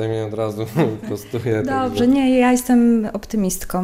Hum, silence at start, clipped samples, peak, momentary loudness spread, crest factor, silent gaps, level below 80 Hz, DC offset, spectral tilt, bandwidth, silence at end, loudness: none; 0 s; under 0.1%; -4 dBFS; 9 LU; 14 dB; none; -42 dBFS; under 0.1%; -6 dB/octave; 16 kHz; 0 s; -19 LUFS